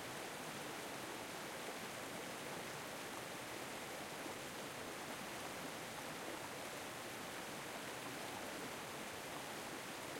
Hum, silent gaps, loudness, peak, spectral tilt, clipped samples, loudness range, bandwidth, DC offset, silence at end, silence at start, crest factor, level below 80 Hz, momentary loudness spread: none; none; -47 LUFS; -32 dBFS; -2.5 dB/octave; under 0.1%; 0 LU; 16.5 kHz; under 0.1%; 0 s; 0 s; 16 dB; -76 dBFS; 1 LU